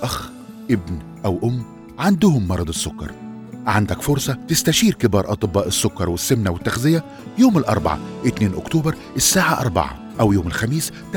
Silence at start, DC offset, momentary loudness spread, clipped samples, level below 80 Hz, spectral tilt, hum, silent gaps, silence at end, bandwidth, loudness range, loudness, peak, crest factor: 0 s; under 0.1%; 12 LU; under 0.1%; -42 dBFS; -4.5 dB/octave; none; none; 0 s; over 20 kHz; 3 LU; -19 LUFS; -2 dBFS; 18 dB